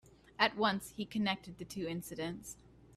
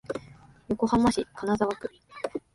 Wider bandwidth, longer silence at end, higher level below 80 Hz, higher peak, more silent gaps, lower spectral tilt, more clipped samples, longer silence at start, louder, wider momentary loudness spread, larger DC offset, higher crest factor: first, 15.5 kHz vs 11.5 kHz; second, 0 s vs 0.15 s; second, -66 dBFS vs -52 dBFS; about the same, -12 dBFS vs -10 dBFS; neither; second, -4 dB/octave vs -6 dB/octave; neither; about the same, 0.05 s vs 0.1 s; second, -36 LUFS vs -28 LUFS; first, 18 LU vs 15 LU; neither; first, 26 dB vs 18 dB